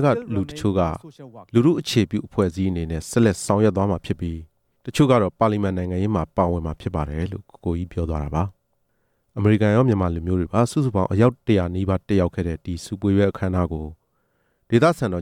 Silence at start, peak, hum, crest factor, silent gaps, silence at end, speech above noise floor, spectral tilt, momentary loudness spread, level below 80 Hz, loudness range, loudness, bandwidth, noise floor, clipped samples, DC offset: 0 s; -4 dBFS; none; 18 dB; none; 0 s; 48 dB; -7 dB/octave; 11 LU; -40 dBFS; 4 LU; -22 LUFS; 15.5 kHz; -69 dBFS; under 0.1%; under 0.1%